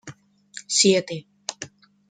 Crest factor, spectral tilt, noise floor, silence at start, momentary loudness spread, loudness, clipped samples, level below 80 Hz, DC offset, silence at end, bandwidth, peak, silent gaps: 22 dB; -2.5 dB/octave; -46 dBFS; 0.05 s; 23 LU; -21 LUFS; under 0.1%; -70 dBFS; under 0.1%; 0.45 s; 9.6 kHz; -4 dBFS; none